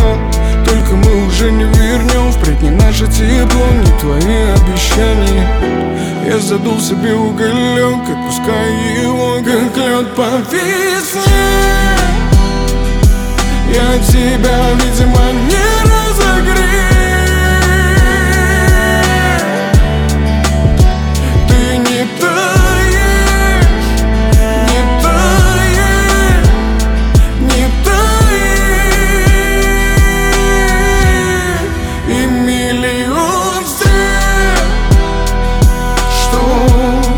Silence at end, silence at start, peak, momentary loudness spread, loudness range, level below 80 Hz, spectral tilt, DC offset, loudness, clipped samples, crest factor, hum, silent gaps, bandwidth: 0 s; 0 s; 0 dBFS; 4 LU; 3 LU; -12 dBFS; -5 dB/octave; under 0.1%; -11 LUFS; under 0.1%; 10 dB; none; none; 19 kHz